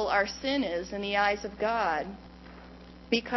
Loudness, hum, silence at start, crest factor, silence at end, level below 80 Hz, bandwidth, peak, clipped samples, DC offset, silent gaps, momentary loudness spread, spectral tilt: -29 LUFS; none; 0 s; 18 dB; 0 s; -54 dBFS; 6.2 kHz; -12 dBFS; under 0.1%; under 0.1%; none; 22 LU; -4 dB/octave